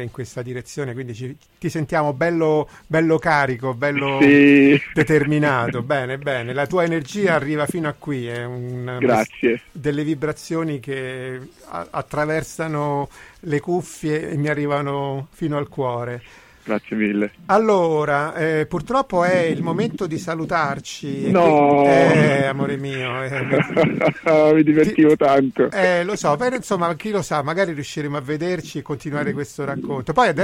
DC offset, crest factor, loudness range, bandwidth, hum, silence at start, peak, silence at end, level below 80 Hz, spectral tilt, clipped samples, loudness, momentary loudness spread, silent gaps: under 0.1%; 16 dB; 8 LU; 15 kHz; none; 0 s; -4 dBFS; 0 s; -52 dBFS; -6.5 dB/octave; under 0.1%; -19 LUFS; 14 LU; none